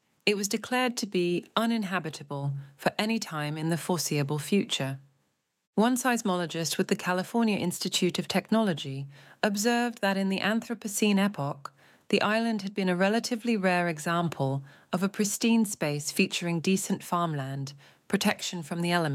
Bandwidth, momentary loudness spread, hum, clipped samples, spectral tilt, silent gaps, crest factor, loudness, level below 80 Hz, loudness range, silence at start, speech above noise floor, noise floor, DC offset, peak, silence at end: 16.5 kHz; 8 LU; none; under 0.1%; -4.5 dB/octave; 5.67-5.73 s; 20 dB; -28 LUFS; -76 dBFS; 2 LU; 0.25 s; 47 dB; -76 dBFS; under 0.1%; -8 dBFS; 0 s